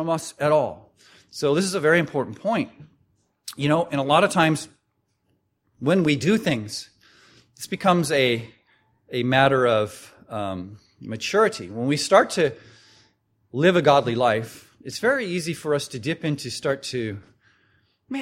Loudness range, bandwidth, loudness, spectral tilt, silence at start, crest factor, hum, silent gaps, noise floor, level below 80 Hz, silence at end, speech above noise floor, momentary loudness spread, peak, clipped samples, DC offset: 4 LU; 16.5 kHz; -22 LUFS; -5 dB/octave; 0 s; 22 dB; none; none; -72 dBFS; -62 dBFS; 0 s; 50 dB; 17 LU; -2 dBFS; under 0.1%; under 0.1%